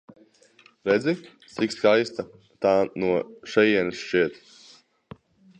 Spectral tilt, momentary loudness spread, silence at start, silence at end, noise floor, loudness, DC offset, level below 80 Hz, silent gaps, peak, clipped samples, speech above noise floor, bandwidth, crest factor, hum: -5.5 dB/octave; 12 LU; 0.85 s; 1.25 s; -57 dBFS; -24 LUFS; under 0.1%; -64 dBFS; none; -6 dBFS; under 0.1%; 34 dB; 9.4 kHz; 20 dB; none